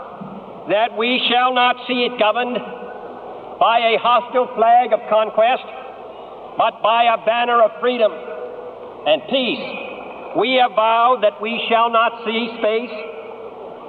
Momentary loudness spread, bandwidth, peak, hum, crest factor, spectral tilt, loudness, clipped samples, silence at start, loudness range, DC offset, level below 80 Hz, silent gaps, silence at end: 19 LU; 4.7 kHz; -2 dBFS; none; 16 dB; -6.5 dB/octave; -17 LUFS; under 0.1%; 0 s; 2 LU; under 0.1%; -66 dBFS; none; 0 s